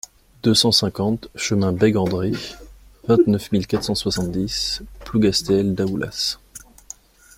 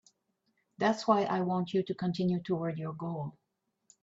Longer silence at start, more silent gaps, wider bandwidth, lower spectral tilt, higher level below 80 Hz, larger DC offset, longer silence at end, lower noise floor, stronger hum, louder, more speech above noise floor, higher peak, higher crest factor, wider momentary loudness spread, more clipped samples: second, 0.45 s vs 0.8 s; neither; first, 16.5 kHz vs 7.8 kHz; second, -5 dB/octave vs -7 dB/octave; first, -44 dBFS vs -74 dBFS; neither; about the same, 0.8 s vs 0.7 s; second, -44 dBFS vs -82 dBFS; neither; first, -20 LUFS vs -32 LUFS; second, 24 dB vs 51 dB; first, -2 dBFS vs -14 dBFS; about the same, 18 dB vs 20 dB; first, 17 LU vs 10 LU; neither